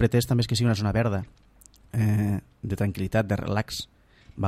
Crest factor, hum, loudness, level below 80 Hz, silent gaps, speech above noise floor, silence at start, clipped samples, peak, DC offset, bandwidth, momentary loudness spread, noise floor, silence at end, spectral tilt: 18 dB; none; -26 LUFS; -48 dBFS; none; 27 dB; 0 s; under 0.1%; -8 dBFS; under 0.1%; 15 kHz; 10 LU; -52 dBFS; 0 s; -6.5 dB/octave